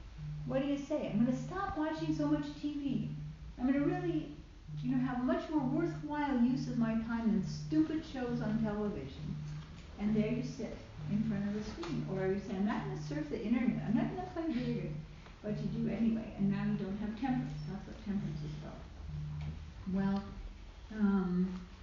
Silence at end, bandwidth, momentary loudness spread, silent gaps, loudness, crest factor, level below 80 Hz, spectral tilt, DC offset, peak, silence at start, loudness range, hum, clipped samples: 0 s; 7.4 kHz; 12 LU; none; -36 LUFS; 16 dB; -52 dBFS; -7 dB/octave; under 0.1%; -20 dBFS; 0 s; 4 LU; none; under 0.1%